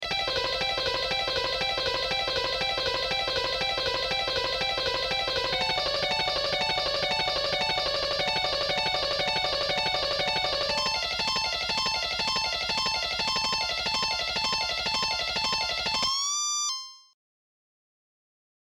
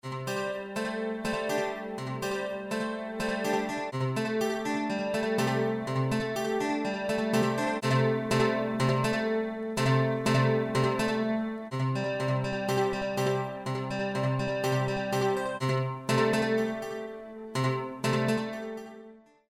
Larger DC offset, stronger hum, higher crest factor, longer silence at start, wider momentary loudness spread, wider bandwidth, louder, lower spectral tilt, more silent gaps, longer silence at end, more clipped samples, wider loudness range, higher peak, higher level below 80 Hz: neither; neither; about the same, 14 dB vs 16 dB; about the same, 0 s vs 0.05 s; second, 1 LU vs 8 LU; about the same, 17 kHz vs 16 kHz; first, -26 LUFS vs -29 LUFS; second, -1 dB/octave vs -6 dB/octave; neither; first, 1.7 s vs 0.3 s; neither; second, 1 LU vs 4 LU; about the same, -14 dBFS vs -14 dBFS; first, -50 dBFS vs -60 dBFS